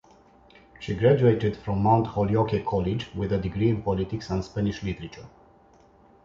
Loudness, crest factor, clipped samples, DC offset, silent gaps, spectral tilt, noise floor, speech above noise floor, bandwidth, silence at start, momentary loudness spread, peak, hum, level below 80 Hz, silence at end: -25 LUFS; 18 dB; under 0.1%; under 0.1%; none; -8.5 dB/octave; -56 dBFS; 32 dB; 7.2 kHz; 0.8 s; 13 LU; -8 dBFS; none; -46 dBFS; 1 s